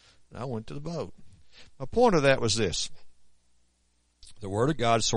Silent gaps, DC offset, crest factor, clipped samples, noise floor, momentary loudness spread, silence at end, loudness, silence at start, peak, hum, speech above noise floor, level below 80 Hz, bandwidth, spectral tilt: none; under 0.1%; 18 dB; under 0.1%; -70 dBFS; 19 LU; 0 s; -27 LUFS; 0.3 s; -10 dBFS; 60 Hz at -55 dBFS; 43 dB; -48 dBFS; 10.5 kHz; -4 dB/octave